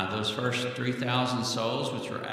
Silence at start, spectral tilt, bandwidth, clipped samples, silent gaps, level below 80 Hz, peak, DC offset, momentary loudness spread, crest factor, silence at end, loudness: 0 s; -4.5 dB/octave; 15.5 kHz; under 0.1%; none; -70 dBFS; -12 dBFS; under 0.1%; 4 LU; 18 dB; 0 s; -29 LUFS